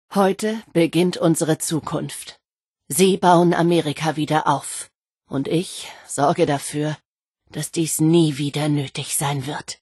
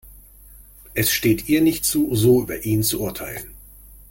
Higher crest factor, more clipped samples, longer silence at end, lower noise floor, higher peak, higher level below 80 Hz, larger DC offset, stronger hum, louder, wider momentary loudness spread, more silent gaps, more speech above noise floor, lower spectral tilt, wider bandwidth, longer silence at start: about the same, 18 dB vs 16 dB; neither; about the same, 0.05 s vs 0.15 s; first, -65 dBFS vs -46 dBFS; first, -2 dBFS vs -6 dBFS; second, -62 dBFS vs -44 dBFS; neither; neither; about the same, -20 LUFS vs -20 LUFS; about the same, 14 LU vs 14 LU; first, 2.68-2.74 s, 4.95-5.01 s, 7.05-7.15 s vs none; first, 45 dB vs 26 dB; about the same, -5 dB/octave vs -4.5 dB/octave; second, 12.5 kHz vs 17 kHz; about the same, 0.1 s vs 0.05 s